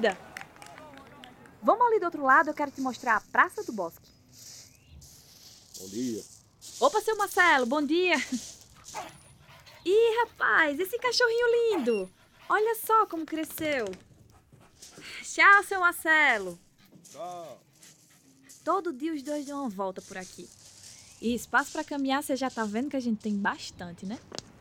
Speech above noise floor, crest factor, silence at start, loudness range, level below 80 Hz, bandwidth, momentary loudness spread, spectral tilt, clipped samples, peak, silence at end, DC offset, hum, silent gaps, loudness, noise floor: 33 dB; 22 dB; 0 s; 10 LU; -66 dBFS; over 20 kHz; 24 LU; -3 dB/octave; under 0.1%; -6 dBFS; 0.4 s; under 0.1%; none; none; -26 LUFS; -60 dBFS